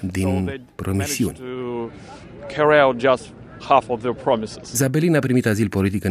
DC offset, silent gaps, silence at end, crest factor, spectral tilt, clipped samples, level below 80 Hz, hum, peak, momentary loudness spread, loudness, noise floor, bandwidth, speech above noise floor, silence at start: under 0.1%; none; 0 s; 20 dB; -5.5 dB/octave; under 0.1%; -50 dBFS; none; 0 dBFS; 16 LU; -20 LUFS; -39 dBFS; 15.5 kHz; 20 dB; 0 s